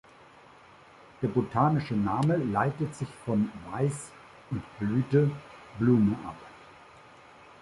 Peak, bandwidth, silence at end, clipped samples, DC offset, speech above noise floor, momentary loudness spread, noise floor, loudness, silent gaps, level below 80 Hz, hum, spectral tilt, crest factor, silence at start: -10 dBFS; 11.5 kHz; 1 s; under 0.1%; under 0.1%; 27 dB; 17 LU; -54 dBFS; -28 LUFS; none; -58 dBFS; none; -8 dB/octave; 18 dB; 1.2 s